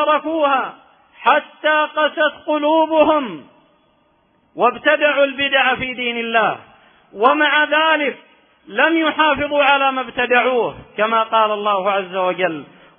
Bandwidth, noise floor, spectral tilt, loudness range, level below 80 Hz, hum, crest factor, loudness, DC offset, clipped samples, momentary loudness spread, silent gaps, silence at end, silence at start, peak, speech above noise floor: 3.7 kHz; -59 dBFS; -8.5 dB/octave; 2 LU; -58 dBFS; none; 18 dB; -16 LUFS; under 0.1%; under 0.1%; 7 LU; none; 0.35 s; 0 s; 0 dBFS; 42 dB